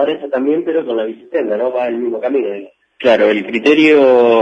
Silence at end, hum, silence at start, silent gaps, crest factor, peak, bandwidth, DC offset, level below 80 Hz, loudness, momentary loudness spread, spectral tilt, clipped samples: 0 s; none; 0 s; none; 14 dB; 0 dBFS; 8.2 kHz; under 0.1%; -64 dBFS; -14 LUFS; 11 LU; -5.5 dB/octave; under 0.1%